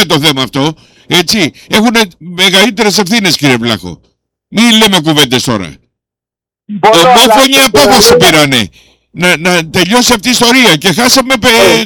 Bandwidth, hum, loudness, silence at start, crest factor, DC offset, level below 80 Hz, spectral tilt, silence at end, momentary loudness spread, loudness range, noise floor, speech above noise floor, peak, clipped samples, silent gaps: over 20 kHz; none; -6 LUFS; 0 s; 8 dB; under 0.1%; -38 dBFS; -3 dB/octave; 0 s; 11 LU; 4 LU; -86 dBFS; 79 dB; 0 dBFS; 0.8%; none